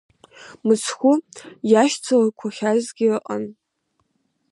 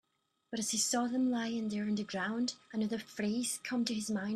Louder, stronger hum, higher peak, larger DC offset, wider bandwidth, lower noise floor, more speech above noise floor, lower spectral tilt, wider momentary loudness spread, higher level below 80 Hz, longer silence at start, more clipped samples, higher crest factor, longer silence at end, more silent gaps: first, -20 LUFS vs -35 LUFS; neither; first, -4 dBFS vs -18 dBFS; neither; second, 11.5 kHz vs 13.5 kHz; about the same, -71 dBFS vs -69 dBFS; first, 51 dB vs 34 dB; first, -4.5 dB/octave vs -3 dB/octave; first, 12 LU vs 6 LU; about the same, -72 dBFS vs -76 dBFS; about the same, 0.4 s vs 0.5 s; neither; about the same, 18 dB vs 16 dB; first, 1 s vs 0 s; neither